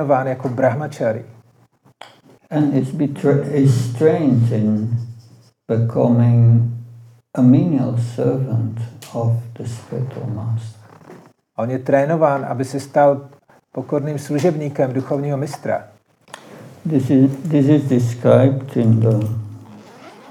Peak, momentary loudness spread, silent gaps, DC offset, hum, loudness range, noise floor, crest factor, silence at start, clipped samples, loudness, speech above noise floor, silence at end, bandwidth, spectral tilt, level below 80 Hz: -2 dBFS; 14 LU; none; under 0.1%; none; 6 LU; -54 dBFS; 16 dB; 0 s; under 0.1%; -18 LUFS; 38 dB; 0.2 s; 11.5 kHz; -8.5 dB/octave; -70 dBFS